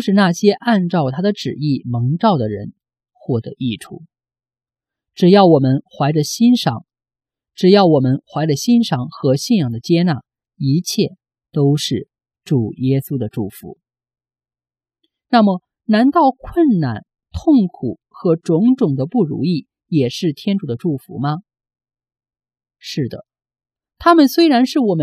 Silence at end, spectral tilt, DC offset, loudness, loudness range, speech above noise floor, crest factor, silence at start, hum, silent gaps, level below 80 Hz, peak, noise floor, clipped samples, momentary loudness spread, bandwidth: 0 s; -6.5 dB/octave; under 0.1%; -16 LUFS; 7 LU; over 75 dB; 16 dB; 0 s; none; none; -50 dBFS; 0 dBFS; under -90 dBFS; under 0.1%; 14 LU; 15 kHz